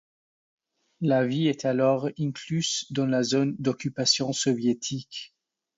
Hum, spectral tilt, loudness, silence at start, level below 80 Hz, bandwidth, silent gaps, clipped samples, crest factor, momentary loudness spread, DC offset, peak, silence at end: none; -4.5 dB/octave; -26 LUFS; 1 s; -68 dBFS; 8 kHz; none; under 0.1%; 18 dB; 9 LU; under 0.1%; -8 dBFS; 0.5 s